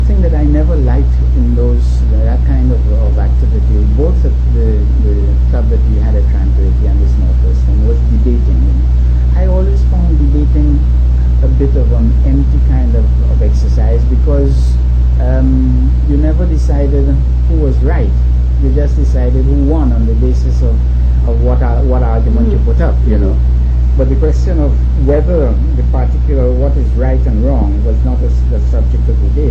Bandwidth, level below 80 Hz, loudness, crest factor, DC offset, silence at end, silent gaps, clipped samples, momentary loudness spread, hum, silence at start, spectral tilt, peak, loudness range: 2.6 kHz; -10 dBFS; -12 LUFS; 8 dB; under 0.1%; 0 s; none; under 0.1%; 2 LU; none; 0 s; -10 dB/octave; -2 dBFS; 1 LU